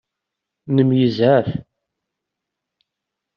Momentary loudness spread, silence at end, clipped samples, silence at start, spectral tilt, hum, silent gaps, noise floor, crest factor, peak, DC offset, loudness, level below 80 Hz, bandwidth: 11 LU; 1.75 s; under 0.1%; 0.65 s; -7 dB/octave; none; none; -82 dBFS; 18 dB; -4 dBFS; under 0.1%; -17 LUFS; -58 dBFS; 6 kHz